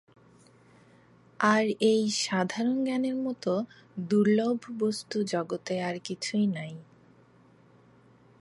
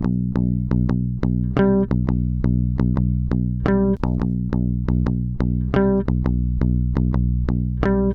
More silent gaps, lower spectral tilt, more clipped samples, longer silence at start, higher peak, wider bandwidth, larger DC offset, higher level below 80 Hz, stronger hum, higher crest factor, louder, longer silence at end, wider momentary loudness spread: neither; second, -5 dB/octave vs -11 dB/octave; neither; first, 1.4 s vs 0 s; second, -10 dBFS vs -2 dBFS; first, 11.5 kHz vs 5.4 kHz; neither; second, -76 dBFS vs -26 dBFS; neither; about the same, 20 dB vs 16 dB; second, -28 LUFS vs -21 LUFS; first, 1.55 s vs 0 s; first, 10 LU vs 4 LU